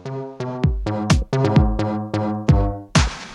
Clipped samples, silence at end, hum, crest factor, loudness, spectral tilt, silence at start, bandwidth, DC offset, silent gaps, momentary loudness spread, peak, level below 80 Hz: under 0.1%; 0 s; none; 18 dB; -20 LUFS; -6 dB/octave; 0 s; 11.5 kHz; under 0.1%; none; 8 LU; -2 dBFS; -26 dBFS